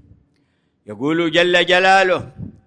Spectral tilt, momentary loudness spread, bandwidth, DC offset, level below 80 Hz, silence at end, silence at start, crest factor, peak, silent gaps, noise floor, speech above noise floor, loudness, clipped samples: -4 dB/octave; 12 LU; 10.5 kHz; under 0.1%; -54 dBFS; 0.15 s; 0.9 s; 16 dB; -2 dBFS; none; -64 dBFS; 48 dB; -15 LUFS; under 0.1%